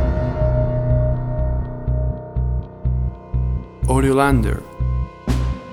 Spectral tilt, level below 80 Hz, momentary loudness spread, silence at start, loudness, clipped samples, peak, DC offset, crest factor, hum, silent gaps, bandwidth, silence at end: -7.5 dB/octave; -22 dBFS; 9 LU; 0 s; -21 LUFS; under 0.1%; -2 dBFS; under 0.1%; 18 dB; none; none; 12.5 kHz; 0 s